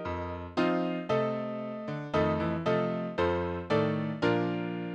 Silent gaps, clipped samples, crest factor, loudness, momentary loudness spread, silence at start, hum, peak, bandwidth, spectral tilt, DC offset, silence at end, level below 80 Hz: none; under 0.1%; 16 dB; -31 LUFS; 7 LU; 0 s; none; -14 dBFS; 8.6 kHz; -8 dB/octave; under 0.1%; 0 s; -60 dBFS